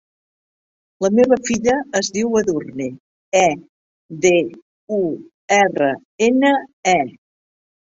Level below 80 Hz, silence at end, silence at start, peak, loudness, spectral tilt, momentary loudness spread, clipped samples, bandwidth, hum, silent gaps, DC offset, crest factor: -56 dBFS; 0.75 s; 1 s; 0 dBFS; -18 LUFS; -4 dB/octave; 13 LU; under 0.1%; 8 kHz; none; 3.00-3.32 s, 3.69-4.09 s, 4.62-4.87 s, 5.34-5.48 s, 6.05-6.18 s, 6.73-6.83 s; under 0.1%; 18 dB